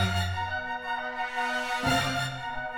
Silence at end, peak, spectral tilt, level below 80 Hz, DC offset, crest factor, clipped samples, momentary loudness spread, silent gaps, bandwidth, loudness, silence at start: 0 s; -14 dBFS; -4 dB/octave; -50 dBFS; under 0.1%; 16 dB; under 0.1%; 6 LU; none; over 20 kHz; -29 LUFS; 0 s